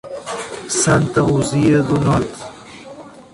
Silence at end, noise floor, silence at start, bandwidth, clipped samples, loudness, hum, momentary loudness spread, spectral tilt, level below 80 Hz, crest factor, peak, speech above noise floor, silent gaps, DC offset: 0.1 s; -37 dBFS; 0.05 s; 11.5 kHz; under 0.1%; -17 LUFS; none; 22 LU; -5.5 dB/octave; -42 dBFS; 14 dB; -2 dBFS; 22 dB; none; under 0.1%